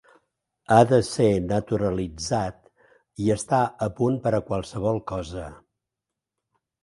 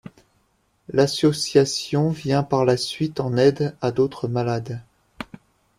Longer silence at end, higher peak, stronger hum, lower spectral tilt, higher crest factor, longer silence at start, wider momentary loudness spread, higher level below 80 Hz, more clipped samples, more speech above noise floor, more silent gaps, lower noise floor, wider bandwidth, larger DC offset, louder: first, 1.3 s vs 0.55 s; about the same, -2 dBFS vs -4 dBFS; neither; about the same, -6.5 dB/octave vs -5.5 dB/octave; about the same, 22 dB vs 18 dB; second, 0.7 s vs 0.9 s; second, 13 LU vs 17 LU; first, -48 dBFS vs -56 dBFS; neither; first, 63 dB vs 45 dB; neither; first, -86 dBFS vs -66 dBFS; second, 11.5 kHz vs 15 kHz; neither; second, -24 LUFS vs -21 LUFS